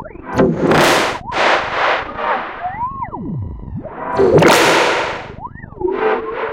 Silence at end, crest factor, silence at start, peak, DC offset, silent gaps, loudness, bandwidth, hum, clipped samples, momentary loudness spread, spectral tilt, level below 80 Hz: 0 s; 16 dB; 0 s; 0 dBFS; under 0.1%; none; -15 LUFS; 17 kHz; none; under 0.1%; 17 LU; -4.5 dB/octave; -40 dBFS